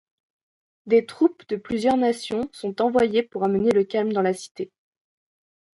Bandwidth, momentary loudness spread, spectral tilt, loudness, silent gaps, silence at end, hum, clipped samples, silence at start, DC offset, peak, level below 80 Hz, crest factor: 11.5 kHz; 11 LU; -6 dB/octave; -23 LUFS; 4.51-4.55 s; 1.1 s; none; under 0.1%; 0.85 s; under 0.1%; -8 dBFS; -62 dBFS; 16 dB